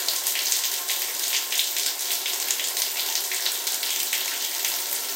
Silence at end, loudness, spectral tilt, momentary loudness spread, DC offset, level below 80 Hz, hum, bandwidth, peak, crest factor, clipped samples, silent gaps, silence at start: 0 s; -23 LUFS; 5 dB/octave; 2 LU; under 0.1%; under -90 dBFS; none; 17 kHz; -4 dBFS; 22 dB; under 0.1%; none; 0 s